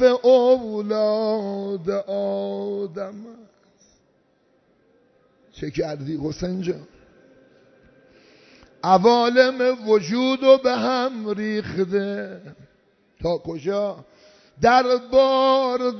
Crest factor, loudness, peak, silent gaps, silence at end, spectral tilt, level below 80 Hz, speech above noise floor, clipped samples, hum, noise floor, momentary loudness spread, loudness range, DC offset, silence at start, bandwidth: 18 dB; -21 LUFS; -2 dBFS; none; 0 s; -5.5 dB/octave; -54 dBFS; 43 dB; under 0.1%; none; -63 dBFS; 14 LU; 13 LU; under 0.1%; 0 s; 6.4 kHz